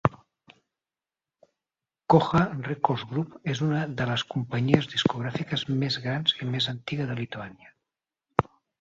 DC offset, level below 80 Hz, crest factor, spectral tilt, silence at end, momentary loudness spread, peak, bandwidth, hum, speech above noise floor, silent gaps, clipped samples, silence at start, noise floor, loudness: under 0.1%; -56 dBFS; 28 dB; -6 dB/octave; 0.4 s; 9 LU; 0 dBFS; 7.8 kHz; none; over 63 dB; none; under 0.1%; 0.05 s; under -90 dBFS; -27 LUFS